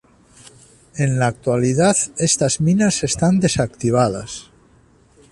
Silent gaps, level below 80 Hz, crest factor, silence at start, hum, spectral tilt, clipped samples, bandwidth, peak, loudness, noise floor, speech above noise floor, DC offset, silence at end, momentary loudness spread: none; -46 dBFS; 16 dB; 0.95 s; none; -5 dB/octave; under 0.1%; 11.5 kHz; -4 dBFS; -18 LUFS; -53 dBFS; 35 dB; under 0.1%; 0.9 s; 9 LU